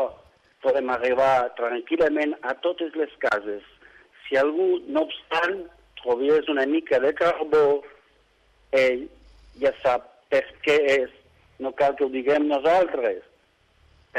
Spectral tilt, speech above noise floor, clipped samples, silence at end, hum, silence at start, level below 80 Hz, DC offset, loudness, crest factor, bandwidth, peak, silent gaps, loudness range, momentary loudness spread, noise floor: -5 dB/octave; 40 dB; under 0.1%; 0 s; none; 0 s; -60 dBFS; under 0.1%; -23 LUFS; 14 dB; 10 kHz; -10 dBFS; none; 3 LU; 11 LU; -62 dBFS